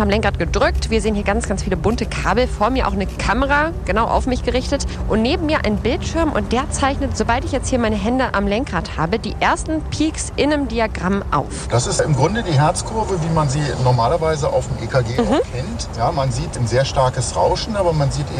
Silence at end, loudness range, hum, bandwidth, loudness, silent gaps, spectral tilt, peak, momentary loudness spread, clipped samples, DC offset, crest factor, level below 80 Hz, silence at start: 0 s; 1 LU; none; 12.5 kHz; -19 LUFS; none; -5.5 dB/octave; -4 dBFS; 5 LU; under 0.1%; under 0.1%; 14 dB; -28 dBFS; 0 s